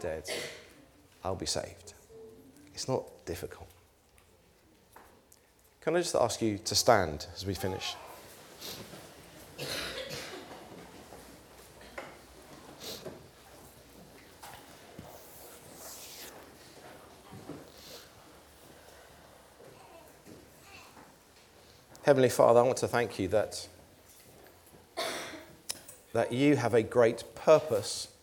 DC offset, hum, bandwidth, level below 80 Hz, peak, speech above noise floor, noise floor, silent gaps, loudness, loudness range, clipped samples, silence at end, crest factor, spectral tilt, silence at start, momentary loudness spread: under 0.1%; none; 20 kHz; -62 dBFS; -8 dBFS; 34 dB; -63 dBFS; none; -30 LUFS; 22 LU; under 0.1%; 0.15 s; 26 dB; -4 dB/octave; 0 s; 28 LU